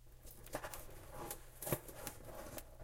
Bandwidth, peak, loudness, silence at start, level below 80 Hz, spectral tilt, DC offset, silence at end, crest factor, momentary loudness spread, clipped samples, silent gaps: 17 kHz; -20 dBFS; -48 LUFS; 0 s; -58 dBFS; -4 dB/octave; under 0.1%; 0 s; 28 dB; 11 LU; under 0.1%; none